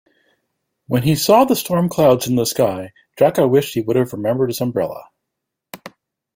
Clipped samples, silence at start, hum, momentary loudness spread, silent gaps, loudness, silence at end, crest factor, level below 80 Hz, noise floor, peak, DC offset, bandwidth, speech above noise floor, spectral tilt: under 0.1%; 0.9 s; none; 19 LU; none; -17 LUFS; 0.5 s; 18 dB; -54 dBFS; -80 dBFS; -2 dBFS; under 0.1%; 16.5 kHz; 63 dB; -5.5 dB/octave